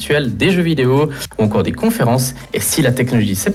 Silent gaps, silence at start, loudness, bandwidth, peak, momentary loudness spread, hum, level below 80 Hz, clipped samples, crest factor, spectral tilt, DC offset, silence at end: none; 0 s; -15 LUFS; 16.5 kHz; -4 dBFS; 5 LU; none; -40 dBFS; under 0.1%; 12 dB; -5 dB/octave; under 0.1%; 0 s